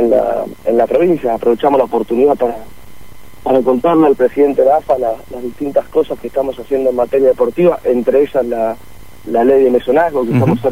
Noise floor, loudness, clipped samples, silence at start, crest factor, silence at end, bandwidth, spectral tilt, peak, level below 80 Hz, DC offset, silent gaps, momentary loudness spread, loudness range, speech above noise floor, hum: -39 dBFS; -13 LUFS; under 0.1%; 0 s; 12 dB; 0 s; 16 kHz; -8 dB/octave; 0 dBFS; -44 dBFS; 2%; none; 8 LU; 1 LU; 26 dB; none